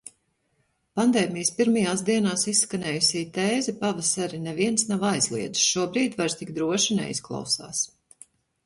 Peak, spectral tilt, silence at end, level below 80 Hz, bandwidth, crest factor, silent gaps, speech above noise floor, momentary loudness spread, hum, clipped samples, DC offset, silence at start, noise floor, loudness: -8 dBFS; -3 dB/octave; 0.8 s; -64 dBFS; 12 kHz; 18 dB; none; 46 dB; 7 LU; none; under 0.1%; under 0.1%; 0.05 s; -71 dBFS; -24 LUFS